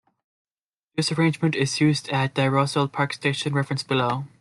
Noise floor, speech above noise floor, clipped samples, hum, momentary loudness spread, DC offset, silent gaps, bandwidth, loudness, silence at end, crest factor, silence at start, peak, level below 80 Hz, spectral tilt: -85 dBFS; 62 dB; under 0.1%; none; 4 LU; under 0.1%; none; 12 kHz; -23 LUFS; 0.15 s; 18 dB; 0.95 s; -6 dBFS; -64 dBFS; -5.5 dB/octave